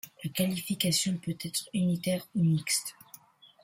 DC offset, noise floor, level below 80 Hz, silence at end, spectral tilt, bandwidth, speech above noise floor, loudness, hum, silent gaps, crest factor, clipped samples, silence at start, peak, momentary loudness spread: under 0.1%; -55 dBFS; -68 dBFS; 0.7 s; -4 dB/octave; 16.5 kHz; 25 dB; -30 LUFS; none; none; 18 dB; under 0.1%; 0.05 s; -12 dBFS; 7 LU